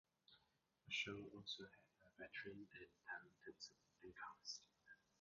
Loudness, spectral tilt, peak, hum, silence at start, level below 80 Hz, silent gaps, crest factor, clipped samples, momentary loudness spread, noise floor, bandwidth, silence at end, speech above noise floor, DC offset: -54 LUFS; -1 dB/octave; -34 dBFS; none; 0.3 s; -84 dBFS; none; 22 dB; under 0.1%; 17 LU; -84 dBFS; 7.2 kHz; 0.25 s; 27 dB; under 0.1%